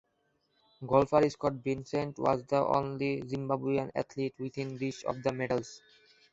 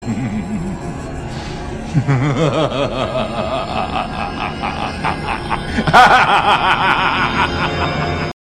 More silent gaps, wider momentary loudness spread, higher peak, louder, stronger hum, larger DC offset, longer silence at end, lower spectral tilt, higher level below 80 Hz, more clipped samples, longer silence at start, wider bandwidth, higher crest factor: neither; second, 9 LU vs 15 LU; second, -10 dBFS vs 0 dBFS; second, -32 LUFS vs -16 LUFS; neither; neither; first, 0.55 s vs 0.15 s; first, -7 dB/octave vs -5.5 dB/octave; second, -62 dBFS vs -34 dBFS; neither; first, 0.8 s vs 0 s; second, 8 kHz vs 15 kHz; first, 22 dB vs 16 dB